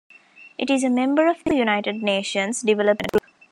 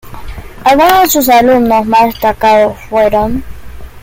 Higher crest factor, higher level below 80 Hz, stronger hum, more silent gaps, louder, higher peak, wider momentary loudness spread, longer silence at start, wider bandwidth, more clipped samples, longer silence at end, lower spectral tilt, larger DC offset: first, 16 dB vs 10 dB; second, -56 dBFS vs -30 dBFS; neither; neither; second, -21 LUFS vs -9 LUFS; second, -6 dBFS vs 0 dBFS; second, 5 LU vs 13 LU; first, 0.4 s vs 0.05 s; second, 14.5 kHz vs 17 kHz; neither; first, 0.3 s vs 0.05 s; about the same, -4 dB/octave vs -4 dB/octave; neither